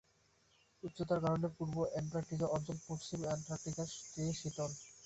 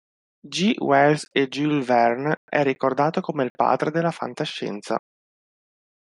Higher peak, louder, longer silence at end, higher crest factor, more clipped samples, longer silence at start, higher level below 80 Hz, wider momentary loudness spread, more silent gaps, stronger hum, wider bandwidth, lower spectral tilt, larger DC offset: second, -24 dBFS vs -4 dBFS; second, -40 LUFS vs -22 LUFS; second, 0 s vs 1.05 s; about the same, 18 dB vs 18 dB; neither; first, 0.85 s vs 0.45 s; first, -66 dBFS vs -74 dBFS; second, 7 LU vs 10 LU; second, none vs 2.37-2.48 s, 3.50-3.55 s; neither; second, 8.2 kHz vs 11.5 kHz; about the same, -6 dB/octave vs -5.5 dB/octave; neither